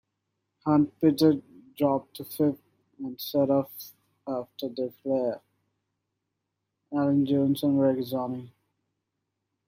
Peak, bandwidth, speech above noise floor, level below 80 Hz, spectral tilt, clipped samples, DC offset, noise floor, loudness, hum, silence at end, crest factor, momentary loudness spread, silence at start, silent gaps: -10 dBFS; 16 kHz; 57 dB; -70 dBFS; -7.5 dB/octave; under 0.1%; under 0.1%; -82 dBFS; -27 LUFS; none; 1.2 s; 18 dB; 16 LU; 0.65 s; none